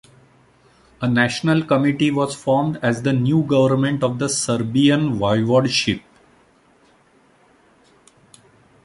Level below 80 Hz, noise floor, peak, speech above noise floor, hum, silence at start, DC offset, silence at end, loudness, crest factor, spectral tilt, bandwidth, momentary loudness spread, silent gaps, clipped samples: -54 dBFS; -55 dBFS; -4 dBFS; 38 dB; none; 1 s; under 0.1%; 2.85 s; -19 LUFS; 16 dB; -5.5 dB/octave; 11.5 kHz; 5 LU; none; under 0.1%